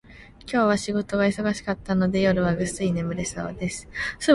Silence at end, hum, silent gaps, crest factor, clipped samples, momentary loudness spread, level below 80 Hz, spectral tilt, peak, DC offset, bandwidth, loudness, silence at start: 0 s; none; none; 20 dB; under 0.1%; 9 LU; -46 dBFS; -5.5 dB/octave; -4 dBFS; under 0.1%; 11.5 kHz; -25 LUFS; 0.1 s